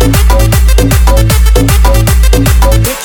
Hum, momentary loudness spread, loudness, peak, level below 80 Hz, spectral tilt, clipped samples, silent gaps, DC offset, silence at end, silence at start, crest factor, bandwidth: none; 0 LU; -8 LUFS; 0 dBFS; -6 dBFS; -5 dB/octave; 3%; none; under 0.1%; 0 s; 0 s; 6 dB; 19.5 kHz